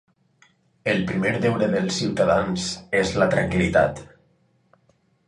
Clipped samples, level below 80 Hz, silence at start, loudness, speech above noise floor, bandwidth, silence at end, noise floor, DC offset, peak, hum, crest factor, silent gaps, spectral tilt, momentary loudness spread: under 0.1%; -46 dBFS; 0.85 s; -22 LUFS; 42 dB; 11.5 kHz; 1.25 s; -64 dBFS; under 0.1%; -6 dBFS; none; 18 dB; none; -5.5 dB/octave; 5 LU